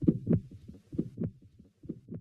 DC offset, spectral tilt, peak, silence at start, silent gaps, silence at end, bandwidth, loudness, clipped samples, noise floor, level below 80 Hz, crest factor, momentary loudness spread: under 0.1%; -12 dB/octave; -10 dBFS; 0 s; none; 0 s; 3.2 kHz; -34 LUFS; under 0.1%; -59 dBFS; -54 dBFS; 24 dB; 20 LU